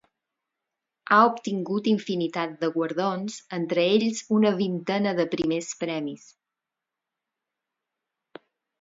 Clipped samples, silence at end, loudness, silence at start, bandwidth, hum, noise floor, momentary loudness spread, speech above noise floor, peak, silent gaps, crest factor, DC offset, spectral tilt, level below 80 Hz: under 0.1%; 2.65 s; -25 LUFS; 1.1 s; 7.8 kHz; none; -87 dBFS; 11 LU; 62 dB; -4 dBFS; none; 22 dB; under 0.1%; -5 dB/octave; -70 dBFS